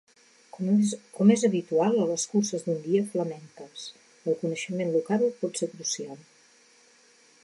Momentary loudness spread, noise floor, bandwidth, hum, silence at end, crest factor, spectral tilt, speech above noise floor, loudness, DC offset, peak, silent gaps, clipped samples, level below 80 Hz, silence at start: 17 LU; -59 dBFS; 11.5 kHz; none; 1.25 s; 20 dB; -5.5 dB/octave; 33 dB; -27 LUFS; under 0.1%; -8 dBFS; none; under 0.1%; -80 dBFS; 0.55 s